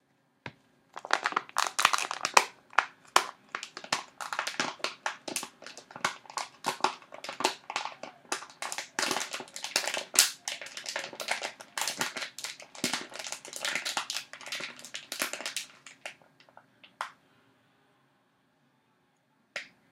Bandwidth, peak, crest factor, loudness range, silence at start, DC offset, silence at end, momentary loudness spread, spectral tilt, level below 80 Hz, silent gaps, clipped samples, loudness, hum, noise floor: 16.5 kHz; 0 dBFS; 34 dB; 12 LU; 0.45 s; under 0.1%; 0.25 s; 16 LU; 0.5 dB/octave; -86 dBFS; none; under 0.1%; -32 LUFS; none; -71 dBFS